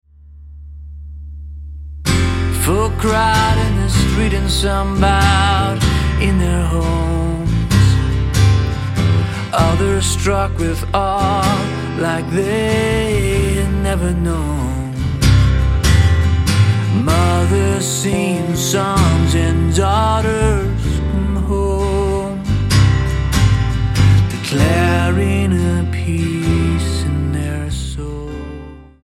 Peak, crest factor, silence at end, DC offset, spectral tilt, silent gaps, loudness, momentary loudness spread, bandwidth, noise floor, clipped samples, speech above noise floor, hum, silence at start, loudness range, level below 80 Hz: 0 dBFS; 14 dB; 0.2 s; under 0.1%; -5.5 dB/octave; none; -16 LUFS; 8 LU; 15.5 kHz; -38 dBFS; under 0.1%; 24 dB; none; 0.3 s; 3 LU; -22 dBFS